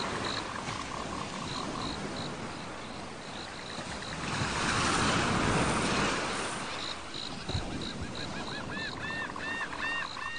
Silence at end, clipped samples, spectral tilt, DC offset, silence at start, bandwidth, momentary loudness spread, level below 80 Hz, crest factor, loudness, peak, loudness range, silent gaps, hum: 0 s; under 0.1%; -3.5 dB/octave; 0.3%; 0 s; 10 kHz; 11 LU; -50 dBFS; 18 dB; -33 LUFS; -16 dBFS; 8 LU; none; none